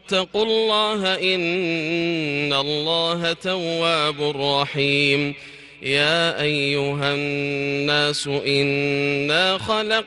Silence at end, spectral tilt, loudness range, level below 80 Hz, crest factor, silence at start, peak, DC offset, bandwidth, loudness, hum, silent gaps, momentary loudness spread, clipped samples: 0 s; -4.5 dB/octave; 1 LU; -58 dBFS; 16 dB; 0.05 s; -6 dBFS; under 0.1%; 12 kHz; -20 LUFS; none; none; 5 LU; under 0.1%